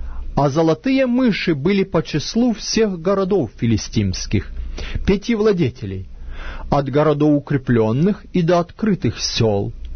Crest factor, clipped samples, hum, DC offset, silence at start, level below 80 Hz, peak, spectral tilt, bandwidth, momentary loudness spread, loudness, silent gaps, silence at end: 16 dB; under 0.1%; none; under 0.1%; 0 s; -32 dBFS; -2 dBFS; -6 dB/octave; 6.6 kHz; 11 LU; -18 LUFS; none; 0 s